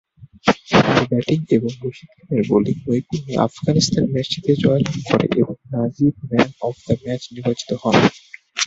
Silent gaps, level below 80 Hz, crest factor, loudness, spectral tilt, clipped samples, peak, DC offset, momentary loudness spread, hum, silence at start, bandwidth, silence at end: none; -48 dBFS; 18 dB; -19 LUFS; -5.5 dB/octave; under 0.1%; 0 dBFS; under 0.1%; 8 LU; none; 0.2 s; 8 kHz; 0 s